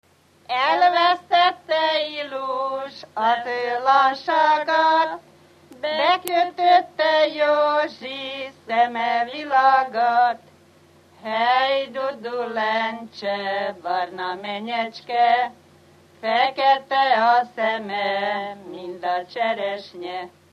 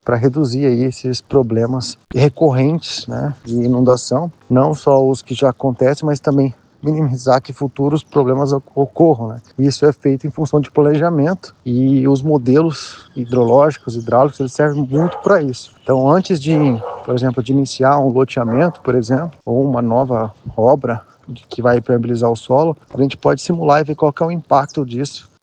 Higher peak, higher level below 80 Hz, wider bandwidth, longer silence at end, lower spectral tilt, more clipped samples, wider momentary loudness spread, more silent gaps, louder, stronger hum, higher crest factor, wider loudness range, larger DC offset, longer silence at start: second, -4 dBFS vs 0 dBFS; second, -74 dBFS vs -50 dBFS; first, 14.5 kHz vs 9.4 kHz; about the same, 0.25 s vs 0.25 s; second, -3.5 dB/octave vs -7 dB/octave; neither; first, 12 LU vs 9 LU; neither; second, -21 LUFS vs -15 LUFS; neither; about the same, 16 dB vs 14 dB; about the same, 4 LU vs 2 LU; neither; first, 0.5 s vs 0.05 s